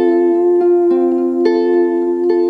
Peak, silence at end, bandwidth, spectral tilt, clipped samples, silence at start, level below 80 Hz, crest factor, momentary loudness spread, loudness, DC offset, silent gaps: -2 dBFS; 0 s; 4.7 kHz; -7 dB/octave; under 0.1%; 0 s; -58 dBFS; 10 dB; 3 LU; -13 LUFS; under 0.1%; none